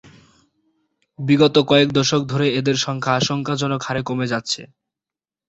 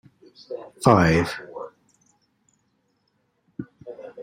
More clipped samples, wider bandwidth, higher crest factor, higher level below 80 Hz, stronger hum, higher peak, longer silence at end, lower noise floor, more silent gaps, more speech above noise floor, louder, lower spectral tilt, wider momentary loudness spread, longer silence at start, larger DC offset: neither; second, 8 kHz vs 15.5 kHz; second, 18 dB vs 24 dB; second, -56 dBFS vs -50 dBFS; neither; about the same, -2 dBFS vs -2 dBFS; first, 0.85 s vs 0 s; first, -90 dBFS vs -70 dBFS; neither; first, 71 dB vs 50 dB; about the same, -19 LUFS vs -20 LUFS; second, -5 dB/octave vs -6.5 dB/octave; second, 9 LU vs 23 LU; first, 1.2 s vs 0.5 s; neither